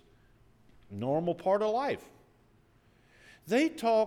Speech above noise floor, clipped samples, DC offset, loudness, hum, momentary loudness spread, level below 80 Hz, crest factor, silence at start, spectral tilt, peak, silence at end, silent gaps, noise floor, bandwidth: 35 dB; under 0.1%; under 0.1%; -30 LUFS; none; 13 LU; -70 dBFS; 16 dB; 0.9 s; -6 dB/octave; -16 dBFS; 0 s; none; -64 dBFS; 16.5 kHz